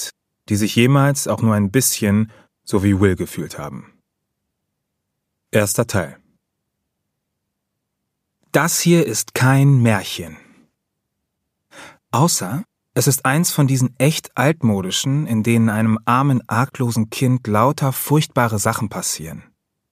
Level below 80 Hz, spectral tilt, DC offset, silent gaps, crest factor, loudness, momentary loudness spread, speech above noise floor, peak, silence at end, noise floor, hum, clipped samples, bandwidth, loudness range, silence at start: -56 dBFS; -5 dB/octave; under 0.1%; none; 18 dB; -18 LUFS; 12 LU; 60 dB; 0 dBFS; 0.5 s; -77 dBFS; none; under 0.1%; 15.5 kHz; 8 LU; 0 s